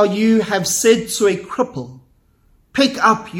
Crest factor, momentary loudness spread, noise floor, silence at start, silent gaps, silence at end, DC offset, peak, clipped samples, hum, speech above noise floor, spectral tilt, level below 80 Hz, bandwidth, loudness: 18 dB; 11 LU; -55 dBFS; 0 s; none; 0 s; under 0.1%; 0 dBFS; under 0.1%; none; 39 dB; -3.5 dB/octave; -54 dBFS; 16.5 kHz; -16 LUFS